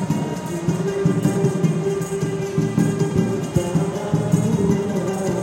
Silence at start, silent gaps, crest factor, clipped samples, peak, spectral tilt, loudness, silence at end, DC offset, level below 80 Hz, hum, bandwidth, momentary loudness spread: 0 s; none; 16 dB; under 0.1%; -4 dBFS; -7 dB/octave; -21 LUFS; 0 s; under 0.1%; -46 dBFS; none; 16.5 kHz; 4 LU